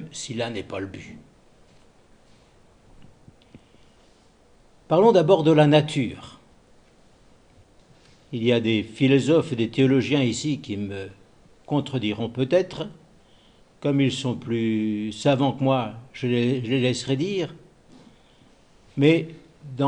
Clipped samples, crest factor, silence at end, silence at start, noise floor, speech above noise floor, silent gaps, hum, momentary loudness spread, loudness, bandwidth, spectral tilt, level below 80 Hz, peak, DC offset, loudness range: under 0.1%; 22 dB; 0 s; 0 s; -56 dBFS; 34 dB; none; none; 17 LU; -22 LUFS; 10.5 kHz; -6.5 dB/octave; -60 dBFS; -4 dBFS; under 0.1%; 7 LU